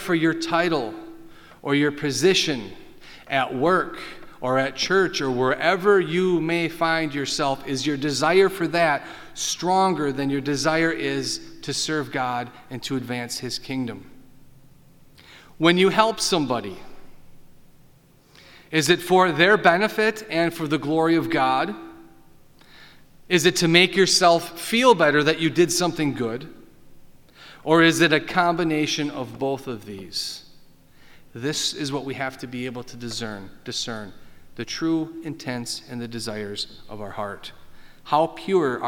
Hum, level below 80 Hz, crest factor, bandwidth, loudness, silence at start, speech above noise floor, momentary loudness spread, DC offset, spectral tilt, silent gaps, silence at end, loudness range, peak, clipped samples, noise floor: none; -54 dBFS; 22 dB; 18.5 kHz; -22 LUFS; 0 s; 32 dB; 16 LU; under 0.1%; -4 dB/octave; none; 0 s; 10 LU; -2 dBFS; under 0.1%; -54 dBFS